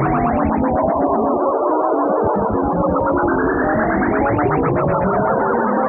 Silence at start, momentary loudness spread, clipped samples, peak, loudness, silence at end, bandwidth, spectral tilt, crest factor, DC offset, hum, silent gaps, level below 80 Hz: 0 s; 1 LU; under 0.1%; -4 dBFS; -17 LUFS; 0 s; 3 kHz; -13 dB/octave; 12 dB; under 0.1%; none; none; -36 dBFS